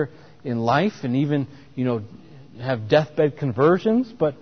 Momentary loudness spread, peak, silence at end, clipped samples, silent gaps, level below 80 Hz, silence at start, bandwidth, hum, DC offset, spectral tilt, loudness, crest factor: 12 LU; -6 dBFS; 0.05 s; under 0.1%; none; -58 dBFS; 0 s; 6.6 kHz; none; 0.3%; -8 dB/octave; -22 LUFS; 16 dB